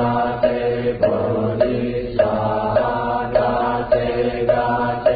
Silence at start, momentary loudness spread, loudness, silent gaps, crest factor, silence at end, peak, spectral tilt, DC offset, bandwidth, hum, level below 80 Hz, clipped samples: 0 s; 2 LU; -19 LUFS; none; 14 dB; 0 s; -4 dBFS; -12 dB/octave; under 0.1%; 5 kHz; none; -40 dBFS; under 0.1%